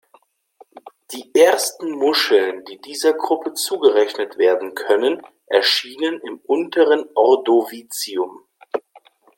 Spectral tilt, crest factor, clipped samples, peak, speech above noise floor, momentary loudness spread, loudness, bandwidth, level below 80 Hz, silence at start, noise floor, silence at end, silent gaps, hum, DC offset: -1.5 dB/octave; 18 dB; under 0.1%; -2 dBFS; 39 dB; 14 LU; -18 LUFS; 17 kHz; -76 dBFS; 0.85 s; -56 dBFS; 0.4 s; none; none; under 0.1%